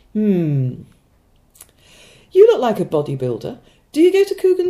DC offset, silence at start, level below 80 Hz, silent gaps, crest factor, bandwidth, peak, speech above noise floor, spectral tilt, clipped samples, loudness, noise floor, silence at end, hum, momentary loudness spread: under 0.1%; 0.15 s; -56 dBFS; none; 18 dB; 15 kHz; 0 dBFS; 39 dB; -7.5 dB/octave; under 0.1%; -16 LUFS; -56 dBFS; 0 s; none; 14 LU